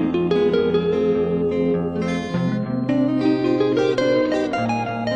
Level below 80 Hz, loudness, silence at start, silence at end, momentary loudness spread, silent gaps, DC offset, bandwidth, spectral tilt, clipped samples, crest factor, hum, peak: -50 dBFS; -20 LUFS; 0 s; 0 s; 4 LU; none; under 0.1%; 9.6 kHz; -7.5 dB/octave; under 0.1%; 12 dB; none; -8 dBFS